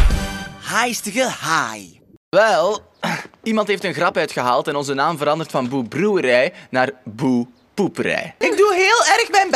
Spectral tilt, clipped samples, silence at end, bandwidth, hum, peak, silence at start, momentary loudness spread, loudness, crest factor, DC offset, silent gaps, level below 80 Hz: -4 dB/octave; under 0.1%; 0 s; 13.5 kHz; none; 0 dBFS; 0 s; 11 LU; -18 LUFS; 18 dB; under 0.1%; 2.17-2.32 s; -32 dBFS